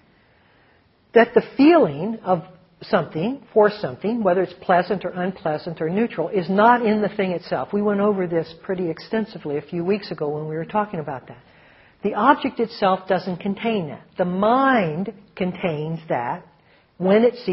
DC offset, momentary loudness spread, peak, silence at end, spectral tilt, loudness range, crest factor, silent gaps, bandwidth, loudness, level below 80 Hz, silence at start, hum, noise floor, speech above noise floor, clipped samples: under 0.1%; 11 LU; 0 dBFS; 0 s; -5 dB/octave; 4 LU; 20 dB; none; 5.8 kHz; -21 LUFS; -60 dBFS; 1.15 s; none; -58 dBFS; 37 dB; under 0.1%